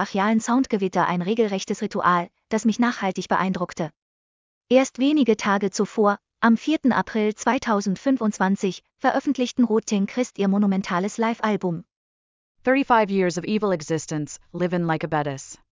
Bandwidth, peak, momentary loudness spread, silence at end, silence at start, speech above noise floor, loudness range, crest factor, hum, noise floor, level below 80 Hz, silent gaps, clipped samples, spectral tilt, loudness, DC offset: 7.6 kHz; -4 dBFS; 7 LU; 0.2 s; 0 s; over 68 dB; 3 LU; 18 dB; none; under -90 dBFS; -62 dBFS; 4.02-4.61 s, 11.96-12.55 s; under 0.1%; -5.5 dB/octave; -23 LUFS; under 0.1%